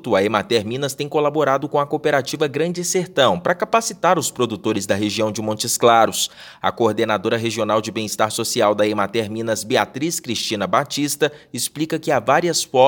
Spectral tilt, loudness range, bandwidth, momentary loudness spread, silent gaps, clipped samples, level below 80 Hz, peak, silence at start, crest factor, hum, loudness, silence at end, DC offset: -3.5 dB/octave; 2 LU; 18 kHz; 6 LU; none; under 0.1%; -64 dBFS; 0 dBFS; 0.05 s; 18 dB; none; -19 LUFS; 0 s; under 0.1%